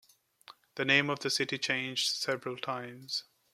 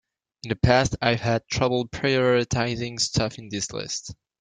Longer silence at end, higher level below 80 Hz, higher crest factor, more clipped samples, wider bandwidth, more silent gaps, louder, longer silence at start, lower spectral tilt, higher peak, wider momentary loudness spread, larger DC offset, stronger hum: about the same, 0.3 s vs 0.3 s; second, -78 dBFS vs -44 dBFS; about the same, 24 dB vs 22 dB; neither; first, 16 kHz vs 9.6 kHz; neither; second, -31 LUFS vs -24 LUFS; about the same, 0.5 s vs 0.45 s; second, -2.5 dB/octave vs -4.5 dB/octave; second, -10 dBFS vs -4 dBFS; about the same, 11 LU vs 11 LU; neither; neither